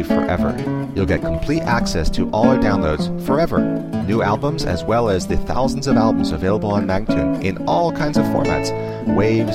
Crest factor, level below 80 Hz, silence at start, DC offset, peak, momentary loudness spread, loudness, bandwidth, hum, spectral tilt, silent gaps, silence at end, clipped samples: 16 dB; -30 dBFS; 0 s; 0.6%; 0 dBFS; 5 LU; -19 LUFS; 15.5 kHz; none; -6.5 dB/octave; none; 0 s; under 0.1%